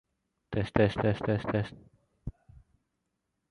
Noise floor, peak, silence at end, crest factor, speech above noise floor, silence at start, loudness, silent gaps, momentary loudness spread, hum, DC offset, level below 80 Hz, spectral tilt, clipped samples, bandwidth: -82 dBFS; -8 dBFS; 1.2 s; 26 dB; 53 dB; 0.5 s; -30 LUFS; none; 19 LU; none; under 0.1%; -52 dBFS; -8 dB/octave; under 0.1%; 10.5 kHz